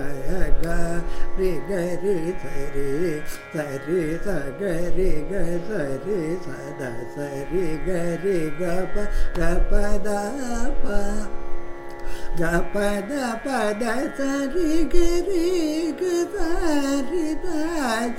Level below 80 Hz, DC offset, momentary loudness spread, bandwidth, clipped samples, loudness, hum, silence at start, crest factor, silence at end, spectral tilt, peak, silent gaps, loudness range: -26 dBFS; under 0.1%; 9 LU; 13 kHz; under 0.1%; -26 LUFS; none; 0 s; 18 dB; 0 s; -5.5 dB/octave; -2 dBFS; none; 4 LU